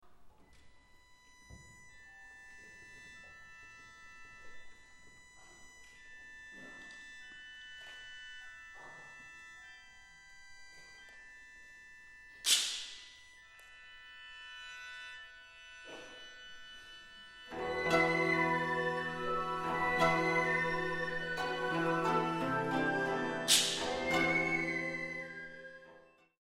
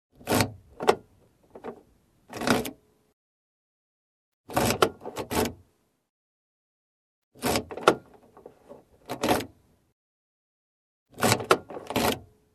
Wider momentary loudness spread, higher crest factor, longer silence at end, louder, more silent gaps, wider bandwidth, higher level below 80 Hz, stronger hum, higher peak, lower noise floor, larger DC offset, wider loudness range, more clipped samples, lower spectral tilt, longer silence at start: first, 25 LU vs 16 LU; about the same, 26 dB vs 30 dB; about the same, 0.4 s vs 0.3 s; second, -33 LUFS vs -27 LUFS; second, none vs 3.13-4.44 s, 6.10-7.31 s, 9.92-11.06 s; first, 16 kHz vs 14 kHz; second, -64 dBFS vs -54 dBFS; neither; second, -14 dBFS vs 0 dBFS; about the same, -62 dBFS vs -65 dBFS; neither; first, 22 LU vs 5 LU; neither; second, -2.5 dB/octave vs -4 dB/octave; second, 0.05 s vs 0.25 s